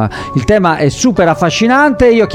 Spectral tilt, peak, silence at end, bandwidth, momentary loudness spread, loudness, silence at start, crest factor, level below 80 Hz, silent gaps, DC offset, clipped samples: -5.5 dB/octave; 0 dBFS; 0 s; 14 kHz; 4 LU; -10 LUFS; 0 s; 10 dB; -32 dBFS; none; under 0.1%; under 0.1%